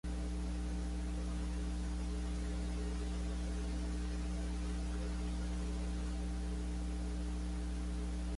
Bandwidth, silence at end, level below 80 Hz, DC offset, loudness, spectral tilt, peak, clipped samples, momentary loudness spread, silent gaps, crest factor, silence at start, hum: 11.5 kHz; 0 s; -40 dBFS; under 0.1%; -41 LUFS; -6 dB/octave; -30 dBFS; under 0.1%; 1 LU; none; 8 dB; 0.05 s; 60 Hz at -40 dBFS